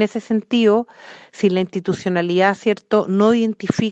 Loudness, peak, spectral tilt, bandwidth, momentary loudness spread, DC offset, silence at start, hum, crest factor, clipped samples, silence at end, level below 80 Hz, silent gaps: -18 LUFS; -2 dBFS; -6.5 dB/octave; 8.2 kHz; 6 LU; under 0.1%; 0 s; none; 16 dB; under 0.1%; 0 s; -60 dBFS; none